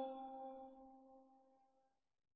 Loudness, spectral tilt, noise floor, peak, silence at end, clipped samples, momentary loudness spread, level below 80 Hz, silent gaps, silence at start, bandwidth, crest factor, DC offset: -55 LUFS; -3.5 dB/octave; -83 dBFS; -36 dBFS; 0.7 s; under 0.1%; 16 LU; -88 dBFS; none; 0 s; 4.3 kHz; 20 dB; under 0.1%